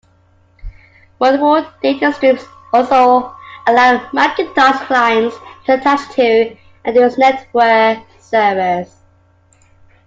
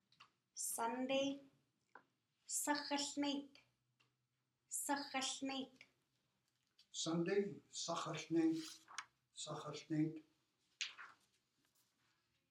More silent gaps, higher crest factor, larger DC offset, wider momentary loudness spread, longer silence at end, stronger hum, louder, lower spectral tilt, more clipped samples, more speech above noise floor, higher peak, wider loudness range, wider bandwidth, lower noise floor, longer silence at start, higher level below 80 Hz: neither; second, 14 dB vs 20 dB; neither; second, 10 LU vs 14 LU; second, 1.25 s vs 1.4 s; neither; first, -13 LUFS vs -43 LUFS; first, -5 dB/octave vs -3.5 dB/octave; neither; second, 39 dB vs 46 dB; first, 0 dBFS vs -26 dBFS; second, 2 LU vs 5 LU; second, 7.8 kHz vs 15 kHz; second, -52 dBFS vs -88 dBFS; first, 0.65 s vs 0.2 s; first, -46 dBFS vs under -90 dBFS